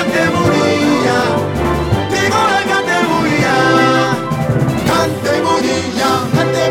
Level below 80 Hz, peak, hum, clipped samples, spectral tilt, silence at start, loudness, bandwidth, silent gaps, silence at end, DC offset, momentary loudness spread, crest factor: -34 dBFS; 0 dBFS; none; under 0.1%; -5 dB/octave; 0 s; -13 LUFS; 16.5 kHz; none; 0 s; under 0.1%; 5 LU; 12 dB